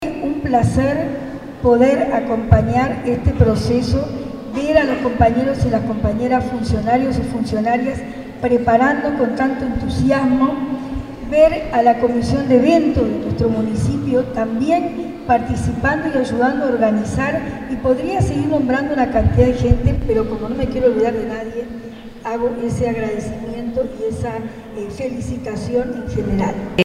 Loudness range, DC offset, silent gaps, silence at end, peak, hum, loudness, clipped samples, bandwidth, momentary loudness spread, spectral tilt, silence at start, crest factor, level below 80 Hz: 7 LU; under 0.1%; none; 0 s; 0 dBFS; none; -18 LUFS; under 0.1%; 12 kHz; 11 LU; -7.5 dB/octave; 0 s; 18 dB; -32 dBFS